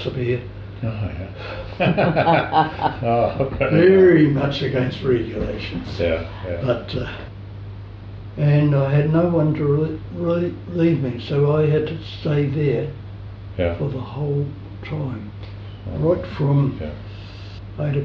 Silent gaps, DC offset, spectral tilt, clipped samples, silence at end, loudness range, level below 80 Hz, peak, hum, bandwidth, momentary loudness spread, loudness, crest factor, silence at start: none; under 0.1%; -9.5 dB/octave; under 0.1%; 0 s; 8 LU; -40 dBFS; -4 dBFS; none; 6 kHz; 18 LU; -20 LUFS; 16 dB; 0 s